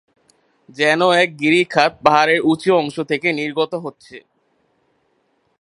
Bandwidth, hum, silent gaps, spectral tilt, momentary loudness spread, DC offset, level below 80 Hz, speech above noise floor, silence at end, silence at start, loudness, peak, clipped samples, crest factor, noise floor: 11.5 kHz; none; none; -4.5 dB/octave; 8 LU; under 0.1%; -62 dBFS; 48 dB; 1.4 s; 0.75 s; -16 LUFS; 0 dBFS; under 0.1%; 18 dB; -64 dBFS